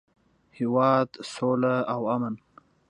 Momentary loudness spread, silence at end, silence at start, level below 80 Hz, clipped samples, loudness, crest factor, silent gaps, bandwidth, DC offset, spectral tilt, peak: 10 LU; 0.55 s; 0.6 s; -72 dBFS; under 0.1%; -26 LUFS; 18 dB; none; 10.5 kHz; under 0.1%; -7 dB/octave; -10 dBFS